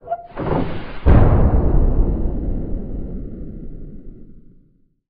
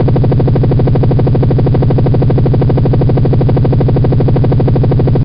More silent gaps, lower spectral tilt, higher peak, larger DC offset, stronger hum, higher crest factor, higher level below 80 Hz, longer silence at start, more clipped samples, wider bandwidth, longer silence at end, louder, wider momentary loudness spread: neither; first, -12 dB/octave vs -10 dB/octave; about the same, 0 dBFS vs 0 dBFS; second, under 0.1% vs 6%; second, none vs 50 Hz at -25 dBFS; first, 18 dB vs 8 dB; about the same, -20 dBFS vs -20 dBFS; about the same, 0.05 s vs 0 s; neither; second, 4.5 kHz vs 5.2 kHz; first, 0.8 s vs 0 s; second, -20 LUFS vs -10 LUFS; first, 22 LU vs 0 LU